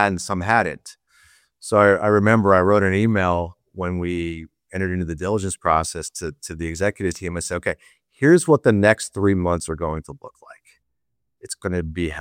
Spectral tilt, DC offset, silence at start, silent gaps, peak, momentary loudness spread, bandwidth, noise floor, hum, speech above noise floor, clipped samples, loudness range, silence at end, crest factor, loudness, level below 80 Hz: -6 dB/octave; under 0.1%; 0 s; none; -2 dBFS; 16 LU; 16.5 kHz; -80 dBFS; none; 60 dB; under 0.1%; 6 LU; 0 s; 20 dB; -20 LUFS; -44 dBFS